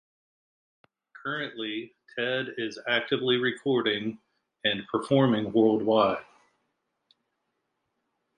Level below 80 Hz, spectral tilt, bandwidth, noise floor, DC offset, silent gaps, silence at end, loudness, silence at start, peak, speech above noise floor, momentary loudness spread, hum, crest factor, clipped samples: -70 dBFS; -6.5 dB/octave; 10 kHz; -79 dBFS; under 0.1%; none; 2.15 s; -27 LUFS; 1.25 s; -10 dBFS; 53 dB; 11 LU; none; 20 dB; under 0.1%